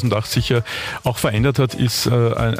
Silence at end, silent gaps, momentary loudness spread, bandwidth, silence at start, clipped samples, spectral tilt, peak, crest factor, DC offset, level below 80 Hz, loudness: 0 s; none; 6 LU; 15.5 kHz; 0 s; under 0.1%; -5.5 dB/octave; -6 dBFS; 12 dB; under 0.1%; -38 dBFS; -19 LUFS